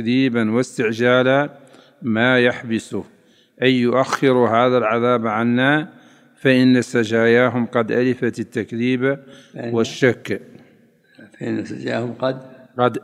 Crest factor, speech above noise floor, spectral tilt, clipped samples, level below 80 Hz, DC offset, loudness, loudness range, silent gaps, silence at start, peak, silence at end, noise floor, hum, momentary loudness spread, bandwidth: 18 dB; 36 dB; -6 dB/octave; under 0.1%; -68 dBFS; under 0.1%; -18 LUFS; 7 LU; none; 0 s; 0 dBFS; 0.05 s; -54 dBFS; none; 13 LU; 11 kHz